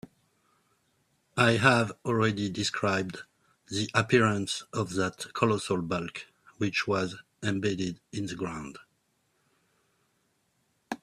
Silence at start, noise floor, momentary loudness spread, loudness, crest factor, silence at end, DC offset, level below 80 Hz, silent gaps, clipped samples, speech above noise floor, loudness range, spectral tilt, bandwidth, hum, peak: 1.35 s; -73 dBFS; 14 LU; -29 LUFS; 24 dB; 0.05 s; under 0.1%; -64 dBFS; none; under 0.1%; 45 dB; 9 LU; -5 dB/octave; 13.5 kHz; none; -6 dBFS